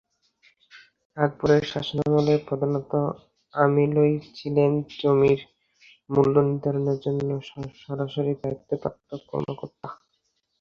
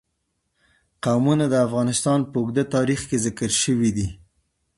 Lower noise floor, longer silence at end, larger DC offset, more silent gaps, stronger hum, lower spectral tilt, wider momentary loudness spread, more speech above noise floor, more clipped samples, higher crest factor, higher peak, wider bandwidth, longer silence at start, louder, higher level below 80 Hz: about the same, -73 dBFS vs -74 dBFS; about the same, 0.65 s vs 0.65 s; neither; first, 1.05-1.10 s vs none; neither; first, -8 dB/octave vs -5 dB/octave; first, 15 LU vs 5 LU; about the same, 50 dB vs 53 dB; neither; about the same, 20 dB vs 16 dB; about the same, -4 dBFS vs -6 dBFS; second, 6.8 kHz vs 11.5 kHz; second, 0.75 s vs 1.05 s; about the same, -24 LUFS vs -22 LUFS; second, -58 dBFS vs -48 dBFS